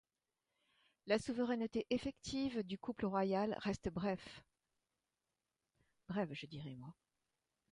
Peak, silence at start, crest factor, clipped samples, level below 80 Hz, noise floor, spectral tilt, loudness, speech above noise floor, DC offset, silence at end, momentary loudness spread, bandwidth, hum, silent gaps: -20 dBFS; 1.05 s; 22 dB; under 0.1%; -68 dBFS; under -90 dBFS; -6 dB/octave; -41 LUFS; over 49 dB; under 0.1%; 0.8 s; 15 LU; 11 kHz; none; none